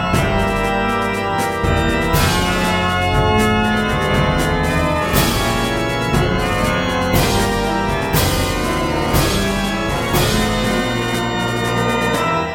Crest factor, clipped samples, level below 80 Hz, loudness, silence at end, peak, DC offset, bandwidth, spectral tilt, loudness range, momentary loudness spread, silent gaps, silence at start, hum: 16 dB; under 0.1%; -26 dBFS; -17 LUFS; 0 s; -2 dBFS; under 0.1%; 17 kHz; -4.5 dB/octave; 1 LU; 3 LU; none; 0 s; none